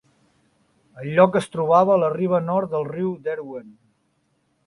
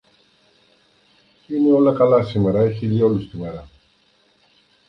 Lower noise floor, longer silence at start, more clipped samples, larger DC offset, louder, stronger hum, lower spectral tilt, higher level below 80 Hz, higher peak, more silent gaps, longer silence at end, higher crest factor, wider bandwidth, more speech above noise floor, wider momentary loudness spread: first, -68 dBFS vs -60 dBFS; second, 0.95 s vs 1.5 s; neither; neither; about the same, -20 LUFS vs -18 LUFS; neither; second, -7.5 dB/octave vs -10 dB/octave; second, -64 dBFS vs -50 dBFS; about the same, -2 dBFS vs -2 dBFS; neither; second, 0.95 s vs 1.25 s; about the same, 20 dB vs 18 dB; first, 11.5 kHz vs 6 kHz; first, 48 dB vs 42 dB; about the same, 16 LU vs 16 LU